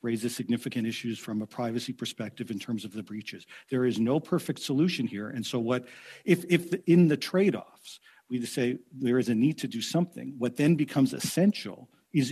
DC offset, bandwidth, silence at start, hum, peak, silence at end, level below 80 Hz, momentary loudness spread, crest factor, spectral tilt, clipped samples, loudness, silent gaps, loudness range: under 0.1%; 14 kHz; 0.05 s; none; -10 dBFS; 0 s; -76 dBFS; 13 LU; 18 dB; -6 dB/octave; under 0.1%; -29 LUFS; none; 6 LU